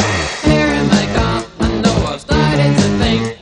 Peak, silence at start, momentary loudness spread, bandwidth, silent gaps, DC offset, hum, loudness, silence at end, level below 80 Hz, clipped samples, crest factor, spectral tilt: 0 dBFS; 0 s; 6 LU; 11 kHz; none; under 0.1%; none; -14 LUFS; 0.05 s; -26 dBFS; under 0.1%; 14 dB; -5.5 dB/octave